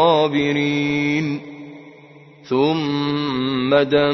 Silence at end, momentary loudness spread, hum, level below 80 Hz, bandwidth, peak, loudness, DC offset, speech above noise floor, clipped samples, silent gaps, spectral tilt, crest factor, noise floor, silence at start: 0 s; 13 LU; none; -56 dBFS; 6.2 kHz; -2 dBFS; -19 LUFS; under 0.1%; 26 dB; under 0.1%; none; -6.5 dB/octave; 16 dB; -45 dBFS; 0 s